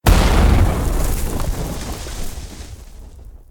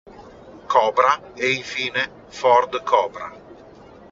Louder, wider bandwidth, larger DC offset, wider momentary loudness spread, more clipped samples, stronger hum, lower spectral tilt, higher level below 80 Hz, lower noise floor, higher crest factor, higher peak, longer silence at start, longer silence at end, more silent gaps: about the same, -19 LUFS vs -20 LUFS; first, 18 kHz vs 7.8 kHz; neither; first, 23 LU vs 11 LU; neither; neither; first, -5.5 dB/octave vs -0.5 dB/octave; first, -20 dBFS vs -60 dBFS; second, -37 dBFS vs -45 dBFS; about the same, 16 dB vs 20 dB; about the same, 0 dBFS vs -2 dBFS; second, 0.05 s vs 0.2 s; second, 0.1 s vs 0.55 s; neither